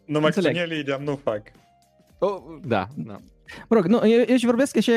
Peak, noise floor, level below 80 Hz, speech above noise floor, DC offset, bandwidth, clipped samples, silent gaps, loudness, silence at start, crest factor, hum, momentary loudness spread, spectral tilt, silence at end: -6 dBFS; -58 dBFS; -60 dBFS; 37 dB; under 0.1%; 15 kHz; under 0.1%; none; -22 LUFS; 0.1 s; 16 dB; none; 18 LU; -6 dB/octave; 0 s